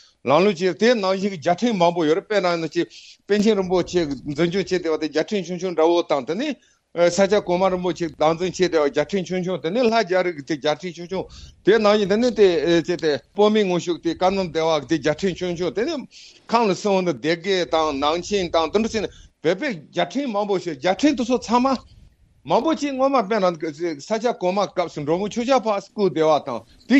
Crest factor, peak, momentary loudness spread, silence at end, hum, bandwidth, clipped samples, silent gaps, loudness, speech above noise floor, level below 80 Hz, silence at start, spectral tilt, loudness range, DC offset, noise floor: 18 dB; -4 dBFS; 8 LU; 0 s; none; 8.4 kHz; under 0.1%; none; -21 LUFS; 31 dB; -54 dBFS; 0.25 s; -5 dB/octave; 3 LU; under 0.1%; -51 dBFS